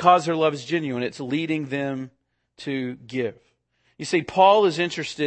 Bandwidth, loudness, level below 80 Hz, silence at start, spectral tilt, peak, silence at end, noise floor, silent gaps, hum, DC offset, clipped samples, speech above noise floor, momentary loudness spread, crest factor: 8.8 kHz; -23 LUFS; -66 dBFS; 0 s; -5 dB/octave; -4 dBFS; 0 s; -68 dBFS; none; none; under 0.1%; under 0.1%; 46 dB; 14 LU; 20 dB